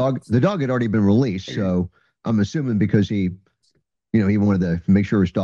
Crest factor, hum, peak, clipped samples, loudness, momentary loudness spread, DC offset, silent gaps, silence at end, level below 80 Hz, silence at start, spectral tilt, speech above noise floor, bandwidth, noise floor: 16 dB; none; -4 dBFS; under 0.1%; -20 LUFS; 7 LU; under 0.1%; none; 0 s; -50 dBFS; 0 s; -8 dB/octave; 48 dB; 7.2 kHz; -67 dBFS